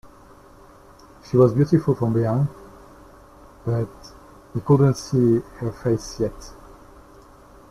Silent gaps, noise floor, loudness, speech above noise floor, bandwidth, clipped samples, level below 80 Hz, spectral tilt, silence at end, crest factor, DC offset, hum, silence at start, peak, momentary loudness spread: none; -48 dBFS; -21 LUFS; 28 dB; 13 kHz; under 0.1%; -48 dBFS; -8 dB/octave; 1.15 s; 18 dB; under 0.1%; none; 1.3 s; -4 dBFS; 15 LU